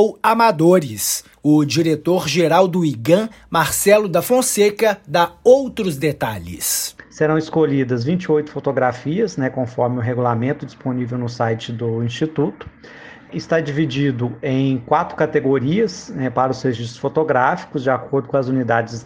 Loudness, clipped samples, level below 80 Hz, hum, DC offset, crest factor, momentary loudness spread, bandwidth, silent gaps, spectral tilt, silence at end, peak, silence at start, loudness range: -18 LUFS; under 0.1%; -52 dBFS; none; under 0.1%; 18 dB; 9 LU; 16.5 kHz; none; -5 dB/octave; 0 s; 0 dBFS; 0 s; 6 LU